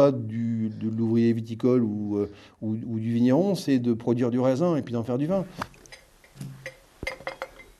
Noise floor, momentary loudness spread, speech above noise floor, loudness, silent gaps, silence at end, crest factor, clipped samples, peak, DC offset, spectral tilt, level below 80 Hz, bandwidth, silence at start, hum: -51 dBFS; 16 LU; 27 dB; -26 LUFS; none; 0.15 s; 20 dB; under 0.1%; -6 dBFS; under 0.1%; -8 dB/octave; -58 dBFS; 12.5 kHz; 0 s; none